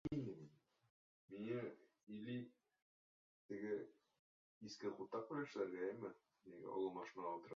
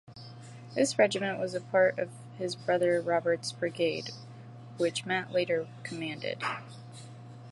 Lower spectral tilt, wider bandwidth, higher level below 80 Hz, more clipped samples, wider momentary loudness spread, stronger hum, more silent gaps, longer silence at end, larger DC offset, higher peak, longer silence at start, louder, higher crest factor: first, -6 dB/octave vs -4.5 dB/octave; second, 7.2 kHz vs 11.5 kHz; second, -80 dBFS vs -74 dBFS; neither; second, 15 LU vs 21 LU; neither; first, 0.90-1.28 s, 2.03-2.07 s, 2.82-3.49 s, 4.19-4.61 s vs none; about the same, 0 s vs 0 s; neither; second, -32 dBFS vs -10 dBFS; about the same, 0.05 s vs 0.1 s; second, -49 LUFS vs -30 LUFS; about the same, 18 dB vs 22 dB